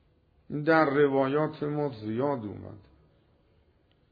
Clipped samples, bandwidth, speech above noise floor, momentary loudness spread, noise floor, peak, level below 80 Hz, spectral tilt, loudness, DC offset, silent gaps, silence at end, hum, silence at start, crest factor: under 0.1%; 5 kHz; 39 dB; 16 LU; -66 dBFS; -10 dBFS; -66 dBFS; -9.5 dB/octave; -27 LUFS; under 0.1%; none; 1.35 s; none; 0.5 s; 20 dB